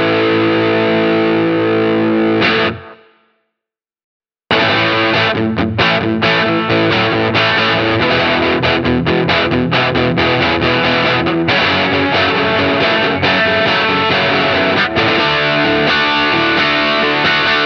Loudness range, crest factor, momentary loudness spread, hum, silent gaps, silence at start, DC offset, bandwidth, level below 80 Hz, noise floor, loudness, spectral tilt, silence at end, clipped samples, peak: 4 LU; 14 dB; 2 LU; none; 4.04-4.20 s; 0 s; under 0.1%; 6.6 kHz; -42 dBFS; -83 dBFS; -12 LUFS; -6 dB/octave; 0 s; under 0.1%; 0 dBFS